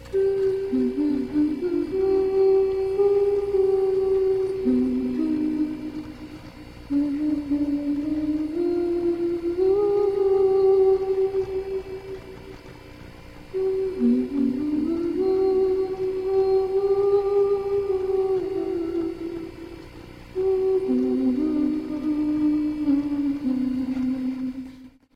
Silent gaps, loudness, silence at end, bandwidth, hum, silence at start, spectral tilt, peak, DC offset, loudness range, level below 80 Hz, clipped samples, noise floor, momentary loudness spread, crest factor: none; -23 LUFS; 0.25 s; 5.4 kHz; none; 0 s; -8 dB/octave; -12 dBFS; under 0.1%; 5 LU; -48 dBFS; under 0.1%; -44 dBFS; 16 LU; 12 dB